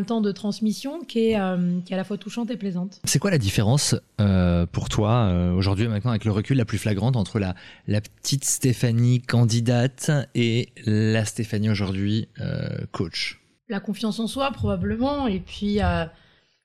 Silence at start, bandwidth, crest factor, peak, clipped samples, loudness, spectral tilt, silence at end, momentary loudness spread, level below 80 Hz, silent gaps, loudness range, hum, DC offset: 0 s; 14.5 kHz; 14 dB; -8 dBFS; under 0.1%; -24 LUFS; -5.5 dB/octave; 0.55 s; 9 LU; -44 dBFS; none; 5 LU; none; 0.2%